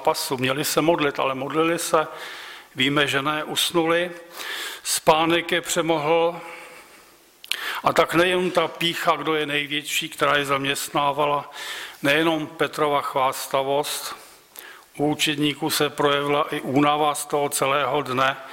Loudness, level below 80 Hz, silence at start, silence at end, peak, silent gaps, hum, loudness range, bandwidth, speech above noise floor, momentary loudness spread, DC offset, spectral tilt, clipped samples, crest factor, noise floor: -22 LUFS; -60 dBFS; 0 s; 0 s; -6 dBFS; none; none; 2 LU; 16.5 kHz; 29 dB; 12 LU; under 0.1%; -3.5 dB/octave; under 0.1%; 18 dB; -51 dBFS